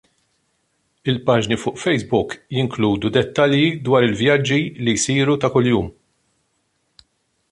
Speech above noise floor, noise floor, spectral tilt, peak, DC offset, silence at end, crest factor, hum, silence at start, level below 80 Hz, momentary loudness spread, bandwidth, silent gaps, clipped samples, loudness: 50 dB; -68 dBFS; -5 dB/octave; -2 dBFS; under 0.1%; 1.6 s; 18 dB; none; 1.05 s; -48 dBFS; 7 LU; 11.5 kHz; none; under 0.1%; -18 LUFS